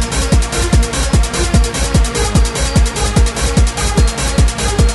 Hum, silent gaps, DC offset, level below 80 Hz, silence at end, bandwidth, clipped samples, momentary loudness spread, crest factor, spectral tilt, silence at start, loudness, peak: none; none; under 0.1%; -14 dBFS; 0 s; 12 kHz; under 0.1%; 0 LU; 12 dB; -4.5 dB/octave; 0 s; -14 LUFS; -2 dBFS